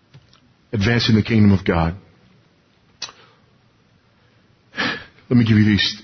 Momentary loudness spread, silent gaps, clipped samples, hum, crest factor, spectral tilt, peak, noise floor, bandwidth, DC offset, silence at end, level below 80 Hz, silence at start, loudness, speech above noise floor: 19 LU; none; under 0.1%; none; 16 dB; -6.5 dB/octave; -4 dBFS; -57 dBFS; 6.4 kHz; under 0.1%; 0 s; -38 dBFS; 0.75 s; -17 LUFS; 41 dB